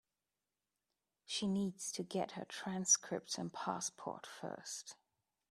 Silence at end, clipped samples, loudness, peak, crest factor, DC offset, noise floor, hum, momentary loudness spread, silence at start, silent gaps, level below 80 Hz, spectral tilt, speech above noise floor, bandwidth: 0.6 s; under 0.1%; -39 LUFS; -18 dBFS; 24 dB; under 0.1%; under -90 dBFS; none; 16 LU; 1.3 s; none; -82 dBFS; -3 dB/octave; over 49 dB; 14 kHz